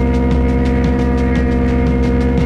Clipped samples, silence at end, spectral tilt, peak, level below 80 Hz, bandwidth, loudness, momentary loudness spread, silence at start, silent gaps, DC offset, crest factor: under 0.1%; 0 s; -8.5 dB/octave; -2 dBFS; -18 dBFS; 7.2 kHz; -15 LUFS; 0 LU; 0 s; none; under 0.1%; 10 dB